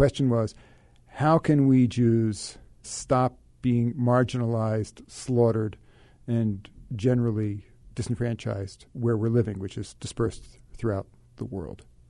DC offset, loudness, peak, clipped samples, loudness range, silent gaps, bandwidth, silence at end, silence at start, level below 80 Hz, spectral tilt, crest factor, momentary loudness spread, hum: under 0.1%; -26 LUFS; -8 dBFS; under 0.1%; 6 LU; none; 11 kHz; 0.35 s; 0 s; -50 dBFS; -7.5 dB/octave; 18 dB; 17 LU; none